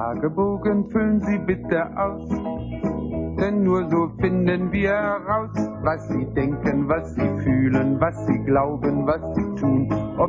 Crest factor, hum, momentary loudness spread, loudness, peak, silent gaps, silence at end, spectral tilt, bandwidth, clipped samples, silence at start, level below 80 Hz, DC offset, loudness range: 16 dB; none; 6 LU; -23 LUFS; -6 dBFS; none; 0 s; -9.5 dB/octave; 7.6 kHz; under 0.1%; 0 s; -40 dBFS; under 0.1%; 2 LU